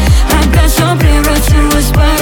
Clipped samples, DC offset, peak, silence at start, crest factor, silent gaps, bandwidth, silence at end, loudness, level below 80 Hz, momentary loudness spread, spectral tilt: under 0.1%; under 0.1%; 0 dBFS; 0 s; 8 dB; none; 19 kHz; 0 s; -9 LUFS; -10 dBFS; 1 LU; -5 dB/octave